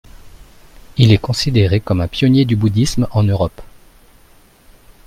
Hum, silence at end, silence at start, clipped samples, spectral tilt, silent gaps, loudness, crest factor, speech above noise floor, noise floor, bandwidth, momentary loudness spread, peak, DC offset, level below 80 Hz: none; 1.4 s; 0.15 s; under 0.1%; -6.5 dB/octave; none; -15 LUFS; 16 dB; 34 dB; -47 dBFS; 14 kHz; 7 LU; 0 dBFS; under 0.1%; -36 dBFS